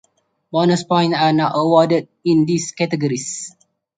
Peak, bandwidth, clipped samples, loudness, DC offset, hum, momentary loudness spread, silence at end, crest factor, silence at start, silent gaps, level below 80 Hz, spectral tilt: -2 dBFS; 9.4 kHz; under 0.1%; -17 LUFS; under 0.1%; none; 9 LU; 0.5 s; 16 dB; 0.55 s; none; -62 dBFS; -5.5 dB/octave